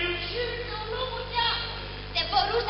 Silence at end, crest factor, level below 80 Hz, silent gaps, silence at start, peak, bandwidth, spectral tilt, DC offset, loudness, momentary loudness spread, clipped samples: 0 s; 18 dB; -42 dBFS; none; 0 s; -10 dBFS; 6 kHz; -1 dB/octave; under 0.1%; -28 LUFS; 8 LU; under 0.1%